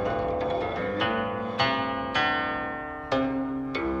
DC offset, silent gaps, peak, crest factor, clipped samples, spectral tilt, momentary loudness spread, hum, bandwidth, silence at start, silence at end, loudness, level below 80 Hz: under 0.1%; none; -10 dBFS; 16 dB; under 0.1%; -6 dB/octave; 5 LU; none; 8 kHz; 0 s; 0 s; -28 LUFS; -48 dBFS